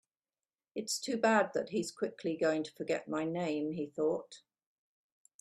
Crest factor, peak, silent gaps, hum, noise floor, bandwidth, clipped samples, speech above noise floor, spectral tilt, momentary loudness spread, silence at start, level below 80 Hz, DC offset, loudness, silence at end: 22 dB; -14 dBFS; none; none; under -90 dBFS; 13 kHz; under 0.1%; over 56 dB; -4 dB/octave; 10 LU; 0.75 s; -78 dBFS; under 0.1%; -34 LUFS; 1 s